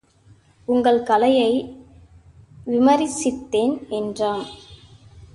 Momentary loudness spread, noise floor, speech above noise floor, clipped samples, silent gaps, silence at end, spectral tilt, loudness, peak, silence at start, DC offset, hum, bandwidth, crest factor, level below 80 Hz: 19 LU; -53 dBFS; 34 dB; under 0.1%; none; 0.1 s; -4.5 dB/octave; -20 LUFS; -4 dBFS; 0.7 s; under 0.1%; none; 11.5 kHz; 16 dB; -54 dBFS